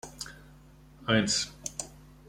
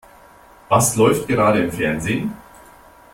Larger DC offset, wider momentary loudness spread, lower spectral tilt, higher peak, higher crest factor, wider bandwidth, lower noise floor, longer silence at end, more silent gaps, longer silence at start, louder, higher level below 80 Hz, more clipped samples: neither; first, 17 LU vs 9 LU; second, -3 dB/octave vs -5 dB/octave; second, -10 dBFS vs -2 dBFS; first, 24 dB vs 18 dB; about the same, 16.5 kHz vs 16.5 kHz; first, -54 dBFS vs -47 dBFS; second, 0.3 s vs 0.8 s; neither; second, 0.05 s vs 0.7 s; second, -29 LUFS vs -18 LUFS; second, -56 dBFS vs -46 dBFS; neither